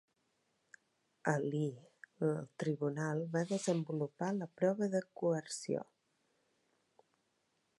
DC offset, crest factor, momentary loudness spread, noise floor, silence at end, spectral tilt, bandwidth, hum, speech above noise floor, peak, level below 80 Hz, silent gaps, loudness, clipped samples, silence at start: under 0.1%; 22 dB; 6 LU; -80 dBFS; 1.95 s; -6 dB/octave; 11.5 kHz; none; 44 dB; -16 dBFS; -86 dBFS; none; -38 LUFS; under 0.1%; 1.25 s